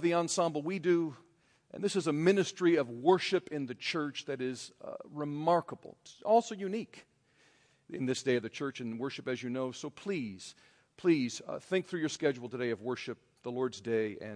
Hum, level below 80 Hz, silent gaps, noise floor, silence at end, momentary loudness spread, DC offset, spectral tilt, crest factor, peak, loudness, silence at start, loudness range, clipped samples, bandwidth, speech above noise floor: none; -80 dBFS; none; -68 dBFS; 0 s; 15 LU; under 0.1%; -5 dB/octave; 22 dB; -12 dBFS; -33 LUFS; 0 s; 6 LU; under 0.1%; 10.5 kHz; 35 dB